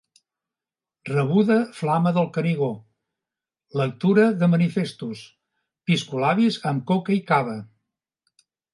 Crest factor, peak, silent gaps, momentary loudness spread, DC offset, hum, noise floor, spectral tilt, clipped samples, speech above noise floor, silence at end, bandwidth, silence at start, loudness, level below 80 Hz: 18 dB; -6 dBFS; none; 15 LU; under 0.1%; none; under -90 dBFS; -7.5 dB/octave; under 0.1%; over 69 dB; 1.1 s; 11.5 kHz; 1.05 s; -22 LUFS; -70 dBFS